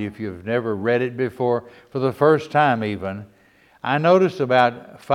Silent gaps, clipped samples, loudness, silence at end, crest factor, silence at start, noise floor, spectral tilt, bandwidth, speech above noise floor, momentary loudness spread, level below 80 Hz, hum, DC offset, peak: none; under 0.1%; -20 LUFS; 0 s; 18 dB; 0 s; -55 dBFS; -7 dB/octave; 13 kHz; 35 dB; 14 LU; -62 dBFS; none; under 0.1%; -2 dBFS